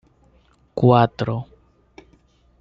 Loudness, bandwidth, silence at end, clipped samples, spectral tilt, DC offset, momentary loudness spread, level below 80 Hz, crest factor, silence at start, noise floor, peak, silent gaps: -19 LUFS; 6.4 kHz; 1.2 s; under 0.1%; -9 dB/octave; under 0.1%; 18 LU; -54 dBFS; 20 dB; 0.75 s; -57 dBFS; -2 dBFS; none